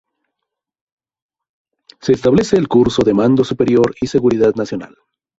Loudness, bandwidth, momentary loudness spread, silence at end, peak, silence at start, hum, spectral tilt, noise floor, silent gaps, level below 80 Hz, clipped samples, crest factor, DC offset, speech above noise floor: -14 LUFS; 8 kHz; 10 LU; 0.5 s; -2 dBFS; 2.05 s; none; -7 dB/octave; -79 dBFS; none; -46 dBFS; under 0.1%; 14 dB; under 0.1%; 66 dB